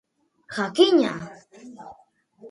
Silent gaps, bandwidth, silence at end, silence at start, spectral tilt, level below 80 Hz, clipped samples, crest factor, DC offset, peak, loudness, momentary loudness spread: none; 11.5 kHz; 0 s; 0.5 s; -4.5 dB/octave; -70 dBFS; under 0.1%; 22 dB; under 0.1%; -4 dBFS; -21 LUFS; 25 LU